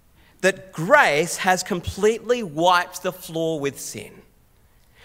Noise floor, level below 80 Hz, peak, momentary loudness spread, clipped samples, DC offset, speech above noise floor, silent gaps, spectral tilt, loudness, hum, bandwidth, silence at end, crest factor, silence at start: -56 dBFS; -52 dBFS; 0 dBFS; 14 LU; under 0.1%; under 0.1%; 35 dB; none; -3.5 dB/octave; -21 LUFS; none; 16 kHz; 0.95 s; 22 dB; 0.4 s